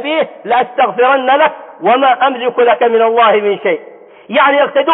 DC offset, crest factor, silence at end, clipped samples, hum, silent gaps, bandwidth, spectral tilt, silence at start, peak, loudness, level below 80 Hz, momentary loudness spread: under 0.1%; 12 dB; 0 s; under 0.1%; none; none; 4 kHz; -9 dB/octave; 0 s; 0 dBFS; -11 LUFS; -72 dBFS; 7 LU